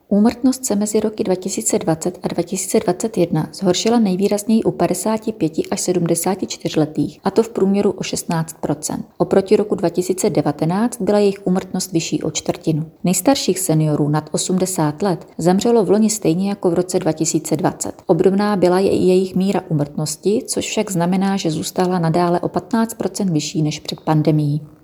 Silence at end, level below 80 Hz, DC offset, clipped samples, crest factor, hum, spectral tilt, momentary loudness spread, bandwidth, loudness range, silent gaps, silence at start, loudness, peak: 0.15 s; -54 dBFS; under 0.1%; under 0.1%; 18 dB; none; -5.5 dB/octave; 6 LU; over 20 kHz; 2 LU; none; 0.1 s; -18 LUFS; 0 dBFS